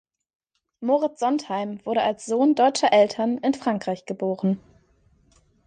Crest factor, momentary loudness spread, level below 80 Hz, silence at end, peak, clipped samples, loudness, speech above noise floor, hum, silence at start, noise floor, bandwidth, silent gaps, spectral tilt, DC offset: 18 dB; 10 LU; -68 dBFS; 1.1 s; -6 dBFS; under 0.1%; -23 LUFS; 39 dB; none; 0.8 s; -61 dBFS; 9.8 kHz; none; -5 dB/octave; under 0.1%